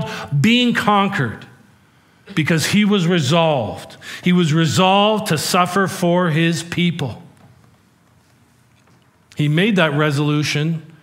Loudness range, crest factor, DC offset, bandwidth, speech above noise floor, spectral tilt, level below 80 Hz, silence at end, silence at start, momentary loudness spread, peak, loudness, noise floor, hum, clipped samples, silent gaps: 6 LU; 18 dB; under 0.1%; 16 kHz; 38 dB; -5 dB/octave; -60 dBFS; 0.15 s; 0 s; 11 LU; 0 dBFS; -17 LUFS; -54 dBFS; none; under 0.1%; none